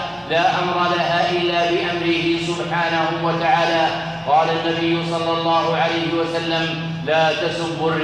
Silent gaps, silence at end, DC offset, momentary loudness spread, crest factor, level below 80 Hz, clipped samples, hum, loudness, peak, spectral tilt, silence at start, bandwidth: none; 0 s; under 0.1%; 4 LU; 14 dB; -52 dBFS; under 0.1%; none; -19 LUFS; -4 dBFS; -5 dB/octave; 0 s; 10 kHz